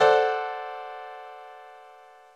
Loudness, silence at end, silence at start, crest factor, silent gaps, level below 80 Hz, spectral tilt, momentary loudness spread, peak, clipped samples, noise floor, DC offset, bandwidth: -27 LUFS; 0.5 s; 0 s; 20 dB; none; -70 dBFS; -2.5 dB/octave; 25 LU; -6 dBFS; under 0.1%; -51 dBFS; under 0.1%; 9.2 kHz